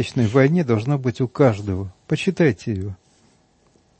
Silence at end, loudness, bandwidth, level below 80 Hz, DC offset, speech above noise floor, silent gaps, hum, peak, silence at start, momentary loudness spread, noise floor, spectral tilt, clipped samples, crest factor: 1.05 s; -20 LUFS; 8.8 kHz; -54 dBFS; under 0.1%; 40 dB; none; none; -2 dBFS; 0 s; 11 LU; -59 dBFS; -7.5 dB/octave; under 0.1%; 18 dB